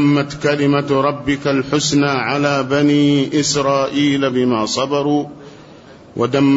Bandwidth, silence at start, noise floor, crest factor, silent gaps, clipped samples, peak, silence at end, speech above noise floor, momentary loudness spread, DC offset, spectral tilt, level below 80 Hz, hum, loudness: 8 kHz; 0 s; -40 dBFS; 12 dB; none; under 0.1%; -4 dBFS; 0 s; 25 dB; 4 LU; under 0.1%; -5 dB/octave; -50 dBFS; none; -16 LUFS